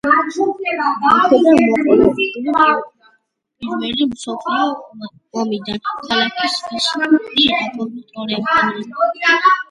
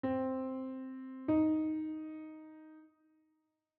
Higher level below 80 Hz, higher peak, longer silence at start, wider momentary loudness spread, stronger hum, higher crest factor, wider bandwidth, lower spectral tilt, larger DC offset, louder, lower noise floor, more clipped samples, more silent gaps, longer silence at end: first, -50 dBFS vs -74 dBFS; first, 0 dBFS vs -22 dBFS; about the same, 0.05 s vs 0.05 s; second, 14 LU vs 22 LU; neither; about the same, 16 dB vs 16 dB; first, 11.5 kHz vs 4.1 kHz; second, -4 dB/octave vs -7.5 dB/octave; neither; first, -16 LUFS vs -37 LUFS; second, -62 dBFS vs -81 dBFS; neither; neither; second, 0.05 s vs 0.9 s